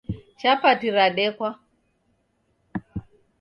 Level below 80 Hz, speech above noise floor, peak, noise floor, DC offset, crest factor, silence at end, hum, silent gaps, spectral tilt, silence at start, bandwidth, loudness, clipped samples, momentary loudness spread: -52 dBFS; 48 dB; -6 dBFS; -69 dBFS; under 0.1%; 20 dB; 0.4 s; none; none; -6.5 dB/octave; 0.1 s; 6.6 kHz; -22 LUFS; under 0.1%; 17 LU